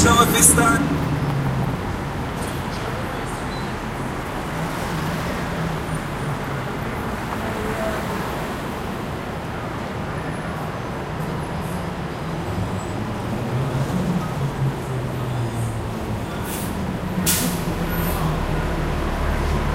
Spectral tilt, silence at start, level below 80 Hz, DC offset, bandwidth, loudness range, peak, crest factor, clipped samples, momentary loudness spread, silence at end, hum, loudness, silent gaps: -4.5 dB/octave; 0 s; -34 dBFS; under 0.1%; 16 kHz; 4 LU; 0 dBFS; 22 dB; under 0.1%; 8 LU; 0 s; none; -23 LUFS; none